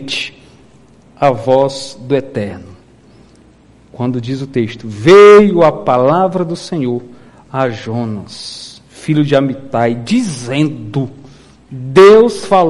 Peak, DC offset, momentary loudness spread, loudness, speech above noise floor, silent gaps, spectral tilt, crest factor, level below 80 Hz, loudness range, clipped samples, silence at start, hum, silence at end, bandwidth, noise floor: 0 dBFS; under 0.1%; 20 LU; -12 LUFS; 33 dB; none; -6 dB/octave; 12 dB; -48 dBFS; 9 LU; 0.4%; 0 s; none; 0 s; 11.5 kHz; -45 dBFS